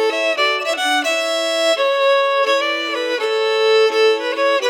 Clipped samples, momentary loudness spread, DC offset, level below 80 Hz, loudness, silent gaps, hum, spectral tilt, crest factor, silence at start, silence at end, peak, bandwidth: under 0.1%; 5 LU; under 0.1%; under -90 dBFS; -16 LUFS; none; none; 1.5 dB/octave; 12 dB; 0 s; 0 s; -4 dBFS; 18 kHz